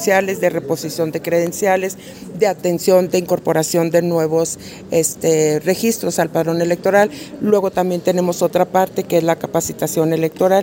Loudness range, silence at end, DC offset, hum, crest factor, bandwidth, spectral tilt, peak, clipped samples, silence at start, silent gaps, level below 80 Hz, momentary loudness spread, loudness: 1 LU; 0 s; under 0.1%; none; 16 dB; 16.5 kHz; -5 dB/octave; -2 dBFS; under 0.1%; 0 s; none; -56 dBFS; 6 LU; -17 LUFS